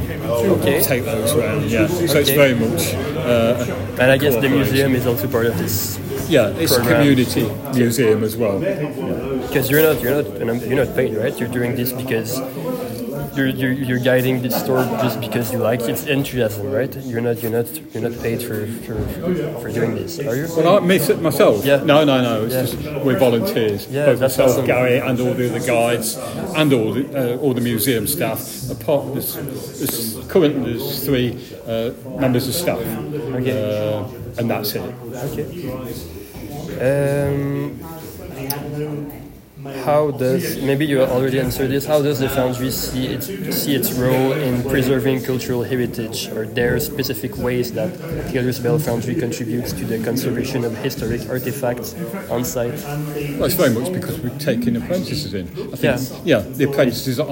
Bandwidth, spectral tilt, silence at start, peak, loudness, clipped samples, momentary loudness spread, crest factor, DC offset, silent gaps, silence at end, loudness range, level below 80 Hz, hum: 17 kHz; -5.5 dB/octave; 0 s; 0 dBFS; -19 LUFS; under 0.1%; 10 LU; 18 dB; under 0.1%; none; 0 s; 7 LU; -44 dBFS; none